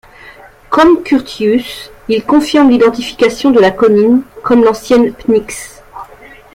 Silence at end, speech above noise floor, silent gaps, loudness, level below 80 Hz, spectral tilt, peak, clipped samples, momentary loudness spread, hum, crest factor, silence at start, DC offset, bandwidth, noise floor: 0.5 s; 27 dB; none; -10 LUFS; -42 dBFS; -5 dB/octave; 0 dBFS; under 0.1%; 17 LU; none; 10 dB; 0.25 s; under 0.1%; 16 kHz; -37 dBFS